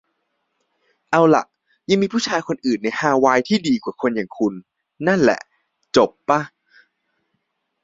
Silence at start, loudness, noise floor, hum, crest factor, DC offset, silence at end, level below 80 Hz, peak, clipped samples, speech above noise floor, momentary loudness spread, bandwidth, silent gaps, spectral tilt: 1.1 s; -19 LUFS; -73 dBFS; none; 20 dB; under 0.1%; 1.35 s; -60 dBFS; 0 dBFS; under 0.1%; 55 dB; 8 LU; 7.8 kHz; none; -5 dB/octave